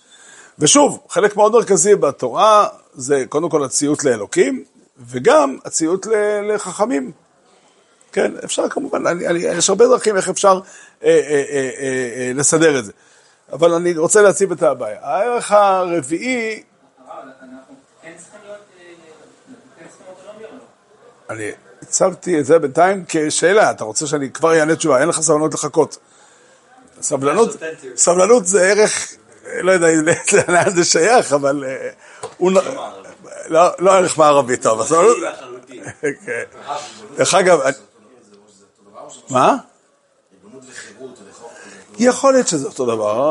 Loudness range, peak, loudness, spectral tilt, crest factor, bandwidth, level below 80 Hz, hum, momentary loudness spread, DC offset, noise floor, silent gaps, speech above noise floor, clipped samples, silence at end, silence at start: 7 LU; 0 dBFS; -15 LUFS; -3.5 dB/octave; 16 dB; 11.5 kHz; -66 dBFS; none; 16 LU; under 0.1%; -58 dBFS; none; 43 dB; under 0.1%; 0 s; 0.6 s